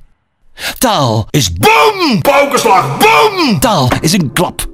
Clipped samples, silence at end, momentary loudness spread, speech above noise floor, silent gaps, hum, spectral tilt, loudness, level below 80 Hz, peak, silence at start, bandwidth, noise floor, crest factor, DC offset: 0.4%; 0 s; 7 LU; 37 dB; none; none; -4 dB/octave; -10 LUFS; -34 dBFS; 0 dBFS; 0.6 s; 16.5 kHz; -46 dBFS; 10 dB; under 0.1%